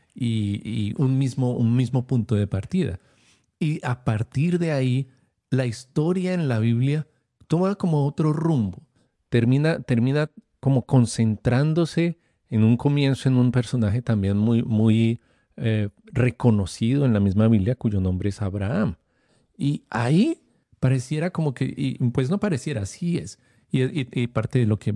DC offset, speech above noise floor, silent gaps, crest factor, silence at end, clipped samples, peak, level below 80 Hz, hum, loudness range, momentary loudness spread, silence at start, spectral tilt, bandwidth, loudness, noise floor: under 0.1%; 43 dB; none; 16 dB; 0 s; under 0.1%; -8 dBFS; -54 dBFS; none; 4 LU; 8 LU; 0.15 s; -7.5 dB/octave; 11.5 kHz; -23 LUFS; -65 dBFS